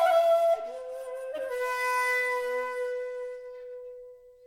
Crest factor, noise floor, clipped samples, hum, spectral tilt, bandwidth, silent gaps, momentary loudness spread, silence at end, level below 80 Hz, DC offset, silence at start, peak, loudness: 16 dB; -49 dBFS; under 0.1%; 60 Hz at -85 dBFS; 0.5 dB/octave; 16.5 kHz; none; 19 LU; 0 s; -72 dBFS; under 0.1%; 0 s; -14 dBFS; -28 LUFS